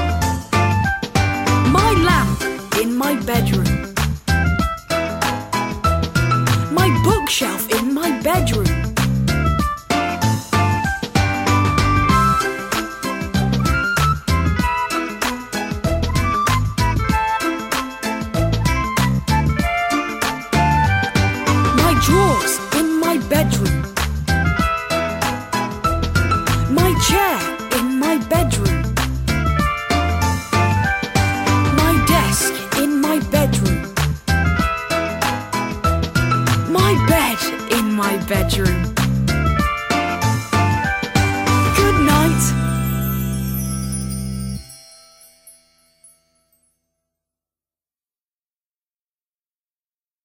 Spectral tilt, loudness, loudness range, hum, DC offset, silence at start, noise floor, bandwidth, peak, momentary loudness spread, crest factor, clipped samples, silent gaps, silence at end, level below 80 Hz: -5 dB/octave; -18 LUFS; 3 LU; none; under 0.1%; 0 s; under -90 dBFS; 16.5 kHz; -2 dBFS; 7 LU; 16 dB; under 0.1%; none; 4.75 s; -28 dBFS